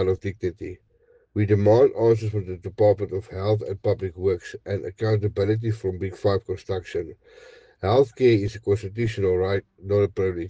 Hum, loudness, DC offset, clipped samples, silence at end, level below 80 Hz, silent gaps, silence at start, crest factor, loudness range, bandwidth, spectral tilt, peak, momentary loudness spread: none; -24 LUFS; under 0.1%; under 0.1%; 0 s; -52 dBFS; none; 0 s; 16 dB; 4 LU; 8 kHz; -8 dB/octave; -6 dBFS; 12 LU